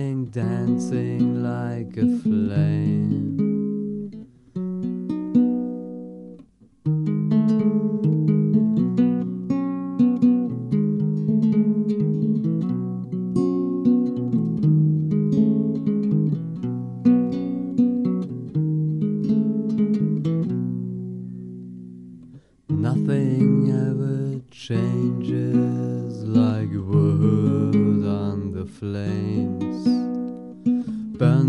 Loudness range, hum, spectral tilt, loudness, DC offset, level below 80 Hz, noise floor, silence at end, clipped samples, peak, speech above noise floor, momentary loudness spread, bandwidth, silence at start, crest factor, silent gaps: 4 LU; none; -10 dB/octave; -22 LUFS; under 0.1%; -58 dBFS; -50 dBFS; 0 s; under 0.1%; -6 dBFS; 28 dB; 11 LU; 8.4 kHz; 0 s; 16 dB; none